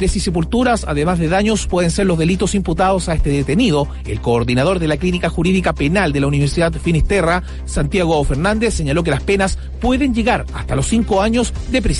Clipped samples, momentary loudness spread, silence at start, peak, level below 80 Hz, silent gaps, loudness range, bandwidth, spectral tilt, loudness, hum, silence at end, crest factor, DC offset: under 0.1%; 4 LU; 0 s; -4 dBFS; -24 dBFS; none; 1 LU; 11.5 kHz; -5.5 dB/octave; -16 LUFS; none; 0 s; 12 dB; under 0.1%